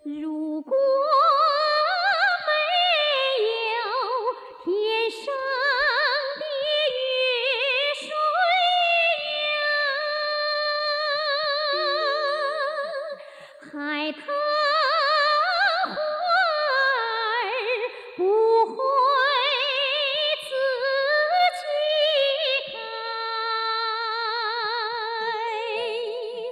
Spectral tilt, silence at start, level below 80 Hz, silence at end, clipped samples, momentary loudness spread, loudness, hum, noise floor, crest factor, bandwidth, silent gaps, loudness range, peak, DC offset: -1.5 dB/octave; 0.05 s; -72 dBFS; 0 s; under 0.1%; 9 LU; -23 LUFS; none; -44 dBFS; 14 dB; 12.5 kHz; none; 4 LU; -10 dBFS; under 0.1%